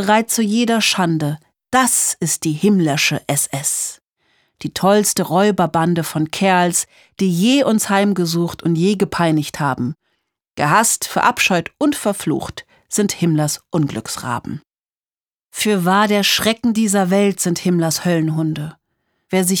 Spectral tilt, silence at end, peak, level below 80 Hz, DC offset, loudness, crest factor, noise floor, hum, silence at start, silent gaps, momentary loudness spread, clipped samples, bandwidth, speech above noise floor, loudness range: -4 dB/octave; 0 s; 0 dBFS; -54 dBFS; under 0.1%; -17 LUFS; 16 dB; under -90 dBFS; none; 0 s; 14.99-15.10 s; 10 LU; under 0.1%; over 20 kHz; over 73 dB; 3 LU